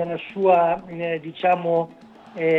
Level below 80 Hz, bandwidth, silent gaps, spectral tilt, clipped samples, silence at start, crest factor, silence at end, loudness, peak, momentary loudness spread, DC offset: -64 dBFS; 5.8 kHz; none; -8 dB/octave; under 0.1%; 0 s; 16 dB; 0 s; -22 LUFS; -6 dBFS; 10 LU; under 0.1%